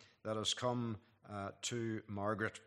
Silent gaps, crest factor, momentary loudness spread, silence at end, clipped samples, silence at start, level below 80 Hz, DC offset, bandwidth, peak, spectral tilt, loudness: none; 18 dB; 10 LU; 0.05 s; under 0.1%; 0 s; -80 dBFS; under 0.1%; 13 kHz; -24 dBFS; -4 dB/octave; -40 LUFS